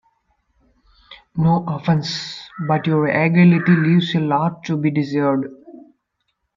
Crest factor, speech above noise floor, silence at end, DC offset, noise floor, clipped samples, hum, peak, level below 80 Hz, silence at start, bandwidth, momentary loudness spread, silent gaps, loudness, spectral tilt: 16 dB; 55 dB; 0.75 s; under 0.1%; -72 dBFS; under 0.1%; none; -2 dBFS; -56 dBFS; 1.1 s; 7.4 kHz; 13 LU; none; -18 LUFS; -7.5 dB/octave